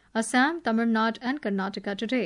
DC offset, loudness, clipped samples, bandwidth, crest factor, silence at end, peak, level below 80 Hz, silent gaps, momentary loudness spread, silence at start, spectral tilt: under 0.1%; -26 LUFS; under 0.1%; 11 kHz; 14 dB; 0 s; -12 dBFS; -68 dBFS; none; 7 LU; 0.15 s; -4.5 dB/octave